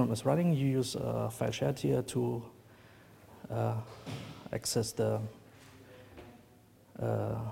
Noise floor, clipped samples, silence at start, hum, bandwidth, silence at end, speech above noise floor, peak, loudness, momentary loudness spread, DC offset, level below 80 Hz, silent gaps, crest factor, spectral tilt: -61 dBFS; under 0.1%; 0 s; none; 16.5 kHz; 0 s; 28 dB; -14 dBFS; -34 LUFS; 23 LU; under 0.1%; -62 dBFS; none; 20 dB; -6 dB/octave